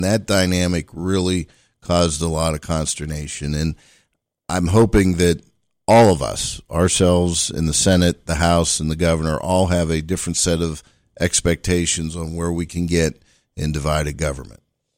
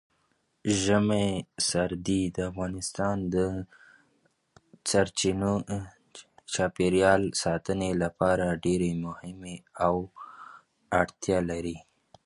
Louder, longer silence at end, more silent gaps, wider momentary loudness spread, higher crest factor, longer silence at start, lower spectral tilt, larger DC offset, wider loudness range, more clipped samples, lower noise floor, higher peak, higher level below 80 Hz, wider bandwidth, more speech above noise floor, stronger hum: first, -19 LUFS vs -28 LUFS; about the same, 0.45 s vs 0.45 s; neither; second, 11 LU vs 17 LU; second, 14 dB vs 22 dB; second, 0 s vs 0.65 s; about the same, -4.5 dB/octave vs -4.5 dB/octave; neither; about the same, 5 LU vs 4 LU; neither; second, -67 dBFS vs -72 dBFS; about the same, -4 dBFS vs -6 dBFS; first, -34 dBFS vs -50 dBFS; first, 16.5 kHz vs 11.5 kHz; about the same, 48 dB vs 45 dB; neither